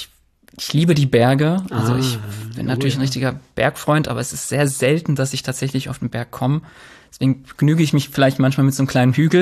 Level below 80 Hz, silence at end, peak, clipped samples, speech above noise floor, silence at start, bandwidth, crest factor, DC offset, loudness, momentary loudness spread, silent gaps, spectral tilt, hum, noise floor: -50 dBFS; 0 s; -2 dBFS; under 0.1%; 35 dB; 0 s; 14 kHz; 16 dB; under 0.1%; -18 LUFS; 9 LU; none; -6 dB/octave; none; -52 dBFS